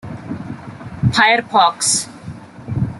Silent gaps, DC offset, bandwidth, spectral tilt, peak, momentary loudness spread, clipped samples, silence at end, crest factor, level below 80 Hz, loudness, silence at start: none; under 0.1%; 12 kHz; -3 dB/octave; -2 dBFS; 21 LU; under 0.1%; 0 s; 18 dB; -44 dBFS; -15 LUFS; 0.05 s